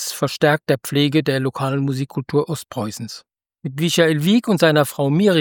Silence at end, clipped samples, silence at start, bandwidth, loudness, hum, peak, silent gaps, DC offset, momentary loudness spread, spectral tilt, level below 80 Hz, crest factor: 0 s; under 0.1%; 0 s; 18 kHz; -19 LUFS; none; -2 dBFS; none; under 0.1%; 13 LU; -5.5 dB/octave; -62 dBFS; 18 dB